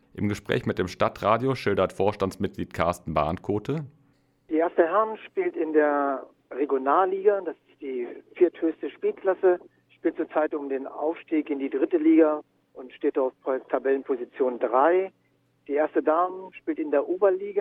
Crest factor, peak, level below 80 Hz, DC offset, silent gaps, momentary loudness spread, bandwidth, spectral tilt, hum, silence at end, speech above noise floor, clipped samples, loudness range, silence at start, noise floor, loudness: 20 dB; -6 dBFS; -58 dBFS; under 0.1%; none; 11 LU; 12 kHz; -7.5 dB/octave; none; 0 s; 41 dB; under 0.1%; 2 LU; 0.15 s; -66 dBFS; -26 LUFS